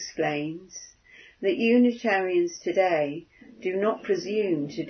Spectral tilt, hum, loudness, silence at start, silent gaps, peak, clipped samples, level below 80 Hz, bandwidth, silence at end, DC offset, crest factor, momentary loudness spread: -5 dB/octave; none; -25 LUFS; 0 s; none; -10 dBFS; under 0.1%; -70 dBFS; 6.6 kHz; 0 s; under 0.1%; 16 dB; 14 LU